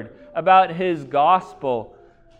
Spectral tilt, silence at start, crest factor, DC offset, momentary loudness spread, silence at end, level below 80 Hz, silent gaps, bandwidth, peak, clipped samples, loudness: -6.5 dB/octave; 0 s; 18 dB; under 0.1%; 11 LU; 0.55 s; -58 dBFS; none; 7.8 kHz; -2 dBFS; under 0.1%; -19 LUFS